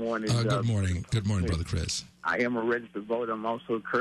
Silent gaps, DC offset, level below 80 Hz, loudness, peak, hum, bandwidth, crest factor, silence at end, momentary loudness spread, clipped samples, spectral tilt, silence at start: none; under 0.1%; -42 dBFS; -29 LUFS; -16 dBFS; none; 12.5 kHz; 12 dB; 0 s; 5 LU; under 0.1%; -5.5 dB/octave; 0 s